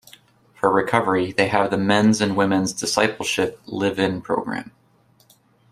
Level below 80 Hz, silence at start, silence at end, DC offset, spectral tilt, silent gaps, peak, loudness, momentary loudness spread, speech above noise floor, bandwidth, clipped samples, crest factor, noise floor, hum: -58 dBFS; 0.65 s; 1.1 s; under 0.1%; -4.5 dB/octave; none; -2 dBFS; -20 LUFS; 7 LU; 38 dB; 15 kHz; under 0.1%; 20 dB; -58 dBFS; none